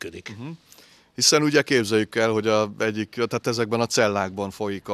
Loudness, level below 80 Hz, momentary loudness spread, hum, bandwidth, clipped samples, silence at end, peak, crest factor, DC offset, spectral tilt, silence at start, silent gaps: -22 LUFS; -66 dBFS; 18 LU; none; 14.5 kHz; under 0.1%; 0 s; -2 dBFS; 20 dB; under 0.1%; -3.5 dB/octave; 0 s; none